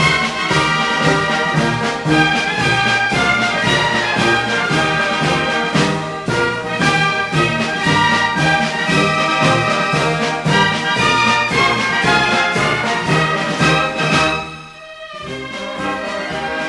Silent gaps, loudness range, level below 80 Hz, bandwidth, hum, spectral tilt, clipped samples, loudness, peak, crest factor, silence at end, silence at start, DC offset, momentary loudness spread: none; 2 LU; -42 dBFS; 12 kHz; none; -4 dB/octave; under 0.1%; -15 LUFS; -4 dBFS; 12 dB; 0 s; 0 s; under 0.1%; 8 LU